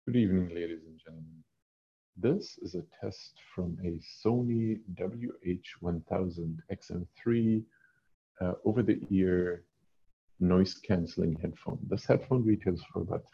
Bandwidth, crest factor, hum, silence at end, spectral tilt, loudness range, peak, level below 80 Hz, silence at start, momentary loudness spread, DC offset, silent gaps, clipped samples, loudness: 7 kHz; 22 dB; none; 0.15 s; -8.5 dB/octave; 6 LU; -12 dBFS; -52 dBFS; 0.05 s; 14 LU; under 0.1%; 1.62-2.13 s, 8.14-8.35 s, 10.13-10.28 s; under 0.1%; -32 LUFS